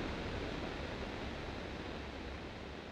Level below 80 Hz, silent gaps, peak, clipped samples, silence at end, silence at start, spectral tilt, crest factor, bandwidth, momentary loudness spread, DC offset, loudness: -50 dBFS; none; -28 dBFS; under 0.1%; 0 s; 0 s; -5.5 dB/octave; 16 dB; 12.5 kHz; 5 LU; under 0.1%; -44 LUFS